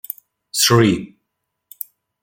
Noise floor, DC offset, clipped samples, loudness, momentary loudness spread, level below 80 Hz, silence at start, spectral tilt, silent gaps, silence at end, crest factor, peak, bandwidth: -76 dBFS; under 0.1%; under 0.1%; -16 LUFS; 20 LU; -54 dBFS; 0.55 s; -4 dB/octave; none; 1.15 s; 18 dB; -2 dBFS; 17 kHz